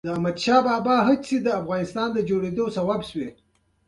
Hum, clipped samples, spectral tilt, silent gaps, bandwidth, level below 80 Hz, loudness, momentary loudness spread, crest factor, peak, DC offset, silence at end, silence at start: none; under 0.1%; -6 dB/octave; none; 11.5 kHz; -58 dBFS; -23 LUFS; 8 LU; 18 dB; -4 dBFS; under 0.1%; 0.55 s; 0.05 s